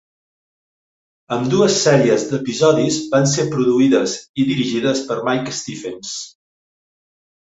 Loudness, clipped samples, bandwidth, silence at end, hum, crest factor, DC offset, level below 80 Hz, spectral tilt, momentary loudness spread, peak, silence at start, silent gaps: -17 LUFS; under 0.1%; 8 kHz; 1.2 s; none; 16 dB; under 0.1%; -58 dBFS; -4.5 dB/octave; 13 LU; -2 dBFS; 1.3 s; 4.29-4.34 s